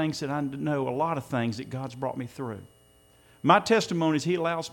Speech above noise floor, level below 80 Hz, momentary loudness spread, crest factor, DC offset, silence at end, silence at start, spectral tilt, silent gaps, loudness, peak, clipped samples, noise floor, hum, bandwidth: 32 dB; -66 dBFS; 14 LU; 22 dB; under 0.1%; 0 s; 0 s; -5.5 dB/octave; none; -27 LUFS; -6 dBFS; under 0.1%; -59 dBFS; none; 17 kHz